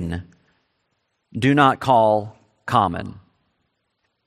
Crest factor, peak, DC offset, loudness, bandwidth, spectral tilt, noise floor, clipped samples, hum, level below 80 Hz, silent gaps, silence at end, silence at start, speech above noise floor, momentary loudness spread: 20 dB; -2 dBFS; under 0.1%; -18 LUFS; 13.5 kHz; -6.5 dB/octave; -73 dBFS; under 0.1%; none; -54 dBFS; none; 1.1 s; 0 s; 54 dB; 21 LU